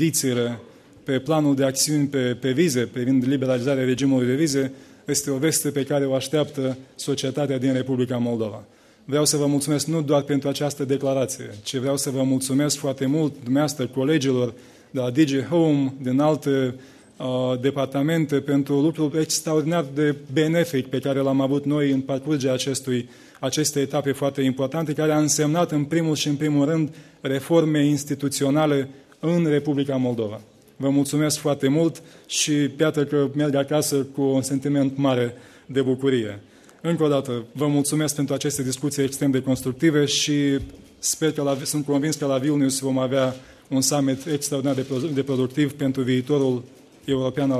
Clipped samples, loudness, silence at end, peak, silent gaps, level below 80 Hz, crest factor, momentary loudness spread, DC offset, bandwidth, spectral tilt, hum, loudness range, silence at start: under 0.1%; -22 LUFS; 0 s; -6 dBFS; none; -60 dBFS; 16 dB; 7 LU; under 0.1%; 14 kHz; -5 dB/octave; none; 2 LU; 0 s